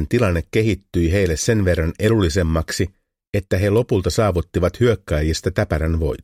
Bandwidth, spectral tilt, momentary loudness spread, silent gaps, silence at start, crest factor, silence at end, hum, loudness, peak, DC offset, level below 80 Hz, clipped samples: 15.5 kHz; -6 dB/octave; 4 LU; 3.27-3.33 s; 0 s; 16 dB; 0 s; none; -19 LUFS; -4 dBFS; under 0.1%; -30 dBFS; under 0.1%